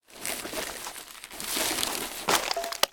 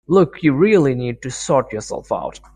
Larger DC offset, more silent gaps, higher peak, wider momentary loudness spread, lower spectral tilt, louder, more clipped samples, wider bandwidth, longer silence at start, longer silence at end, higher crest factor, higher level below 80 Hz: neither; neither; about the same, -4 dBFS vs -2 dBFS; about the same, 12 LU vs 12 LU; second, -0.5 dB/octave vs -6.5 dB/octave; second, -29 LUFS vs -18 LUFS; neither; first, 19 kHz vs 10.5 kHz; about the same, 0.1 s vs 0.1 s; second, 0 s vs 0.25 s; first, 26 dB vs 16 dB; second, -58 dBFS vs -48 dBFS